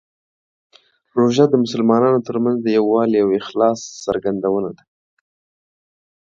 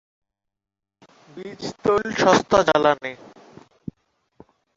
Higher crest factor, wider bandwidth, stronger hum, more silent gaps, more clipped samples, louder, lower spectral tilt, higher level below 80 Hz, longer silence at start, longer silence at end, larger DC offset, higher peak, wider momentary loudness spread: about the same, 18 dB vs 22 dB; about the same, 7.6 kHz vs 8 kHz; neither; neither; neither; about the same, -17 LUFS vs -19 LUFS; first, -6.5 dB/octave vs -4.5 dB/octave; about the same, -60 dBFS vs -56 dBFS; second, 1.15 s vs 1.35 s; second, 1.45 s vs 1.6 s; neither; about the same, 0 dBFS vs -2 dBFS; second, 9 LU vs 23 LU